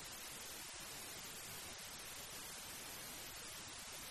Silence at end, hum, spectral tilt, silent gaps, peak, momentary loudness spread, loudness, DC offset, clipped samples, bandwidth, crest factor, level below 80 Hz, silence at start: 0 s; none; -1 dB/octave; none; -38 dBFS; 1 LU; -49 LUFS; under 0.1%; under 0.1%; 13.5 kHz; 14 dB; -70 dBFS; 0 s